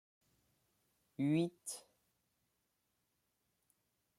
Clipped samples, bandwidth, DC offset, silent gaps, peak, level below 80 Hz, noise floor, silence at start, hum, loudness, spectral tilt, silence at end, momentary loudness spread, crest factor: under 0.1%; 15.5 kHz; under 0.1%; none; -26 dBFS; -86 dBFS; -84 dBFS; 1.2 s; none; -39 LUFS; -6 dB/octave; 2.4 s; 16 LU; 20 dB